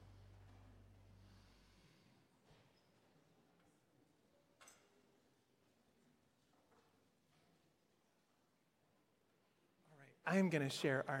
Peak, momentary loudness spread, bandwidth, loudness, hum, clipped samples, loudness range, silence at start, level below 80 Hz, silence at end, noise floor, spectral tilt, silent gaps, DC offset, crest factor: -24 dBFS; 4 LU; 16 kHz; -40 LUFS; none; under 0.1%; 14 LU; 0.05 s; -78 dBFS; 0 s; -80 dBFS; -5.5 dB/octave; none; under 0.1%; 26 dB